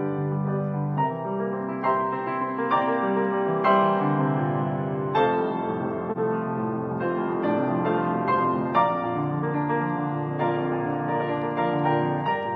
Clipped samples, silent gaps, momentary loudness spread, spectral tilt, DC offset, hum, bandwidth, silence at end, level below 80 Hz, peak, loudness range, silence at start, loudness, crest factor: under 0.1%; none; 5 LU; -10 dB/octave; under 0.1%; none; 5.8 kHz; 0 s; -68 dBFS; -8 dBFS; 2 LU; 0 s; -25 LUFS; 16 dB